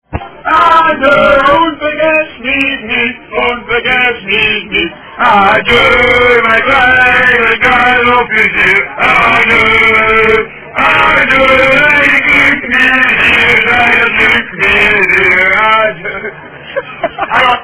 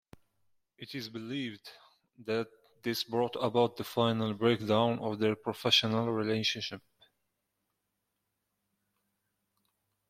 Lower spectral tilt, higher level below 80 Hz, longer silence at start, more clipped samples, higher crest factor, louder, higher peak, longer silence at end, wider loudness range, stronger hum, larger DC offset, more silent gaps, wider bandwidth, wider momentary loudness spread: first, -7 dB/octave vs -5 dB/octave; first, -34 dBFS vs -72 dBFS; second, 0.1 s vs 0.8 s; first, 1% vs under 0.1%; second, 8 dB vs 22 dB; first, -7 LUFS vs -31 LUFS; first, 0 dBFS vs -12 dBFS; second, 0 s vs 3.3 s; second, 4 LU vs 9 LU; neither; neither; neither; second, 4 kHz vs 16 kHz; second, 8 LU vs 17 LU